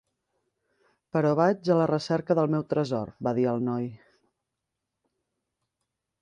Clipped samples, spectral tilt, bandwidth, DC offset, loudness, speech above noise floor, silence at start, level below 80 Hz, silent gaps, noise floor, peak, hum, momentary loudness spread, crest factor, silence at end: under 0.1%; -8 dB/octave; 9.8 kHz; under 0.1%; -26 LUFS; 59 dB; 1.15 s; -68 dBFS; none; -85 dBFS; -10 dBFS; none; 8 LU; 20 dB; 2.25 s